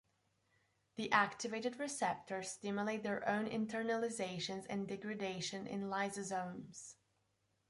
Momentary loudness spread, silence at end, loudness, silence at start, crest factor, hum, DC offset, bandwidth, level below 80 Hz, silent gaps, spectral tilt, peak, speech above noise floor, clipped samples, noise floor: 10 LU; 0.75 s; -40 LUFS; 0.95 s; 24 dB; none; under 0.1%; 11.5 kHz; -80 dBFS; none; -4 dB/octave; -18 dBFS; 41 dB; under 0.1%; -81 dBFS